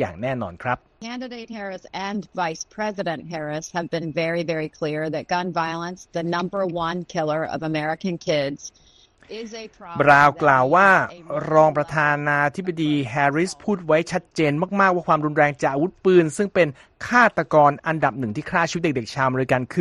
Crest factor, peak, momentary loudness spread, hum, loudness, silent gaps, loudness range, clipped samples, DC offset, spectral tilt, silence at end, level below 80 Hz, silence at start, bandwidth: 20 dB; -2 dBFS; 14 LU; none; -21 LUFS; none; 9 LU; under 0.1%; under 0.1%; -5.5 dB/octave; 0 s; -56 dBFS; 0 s; 12 kHz